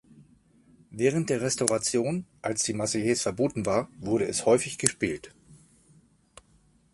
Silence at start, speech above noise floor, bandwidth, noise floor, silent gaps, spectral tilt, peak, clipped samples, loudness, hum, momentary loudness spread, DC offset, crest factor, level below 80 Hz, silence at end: 0.15 s; 36 dB; 12 kHz; -63 dBFS; none; -4 dB/octave; 0 dBFS; under 0.1%; -27 LUFS; none; 8 LU; under 0.1%; 28 dB; -60 dBFS; 1.4 s